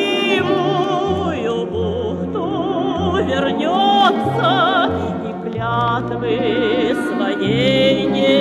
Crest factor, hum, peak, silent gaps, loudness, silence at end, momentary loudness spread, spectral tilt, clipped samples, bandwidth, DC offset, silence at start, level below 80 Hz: 16 dB; none; -2 dBFS; none; -17 LUFS; 0 s; 7 LU; -6 dB/octave; under 0.1%; 13 kHz; under 0.1%; 0 s; -44 dBFS